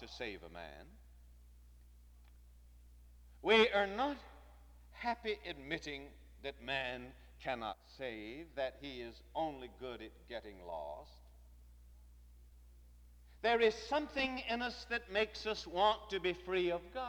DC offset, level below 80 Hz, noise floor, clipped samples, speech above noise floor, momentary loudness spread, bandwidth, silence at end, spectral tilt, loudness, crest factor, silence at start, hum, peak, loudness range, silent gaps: under 0.1%; -60 dBFS; -60 dBFS; under 0.1%; 22 dB; 18 LU; over 20 kHz; 0 s; -4 dB/octave; -38 LUFS; 24 dB; 0 s; 60 Hz at -60 dBFS; -16 dBFS; 15 LU; none